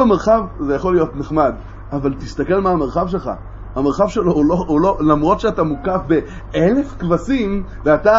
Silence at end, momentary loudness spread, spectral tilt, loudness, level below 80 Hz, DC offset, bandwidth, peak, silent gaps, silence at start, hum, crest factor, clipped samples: 0 s; 8 LU; -8 dB/octave; -17 LUFS; -32 dBFS; under 0.1%; 7.8 kHz; 0 dBFS; none; 0 s; none; 16 dB; under 0.1%